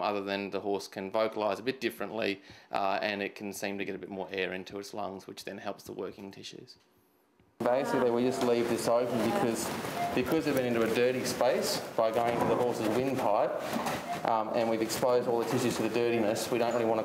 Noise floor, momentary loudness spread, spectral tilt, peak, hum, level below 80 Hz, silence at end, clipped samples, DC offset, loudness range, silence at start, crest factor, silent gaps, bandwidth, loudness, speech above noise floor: -67 dBFS; 12 LU; -4.5 dB/octave; -12 dBFS; none; -68 dBFS; 0 s; under 0.1%; under 0.1%; 9 LU; 0 s; 20 dB; none; 16 kHz; -31 LUFS; 36 dB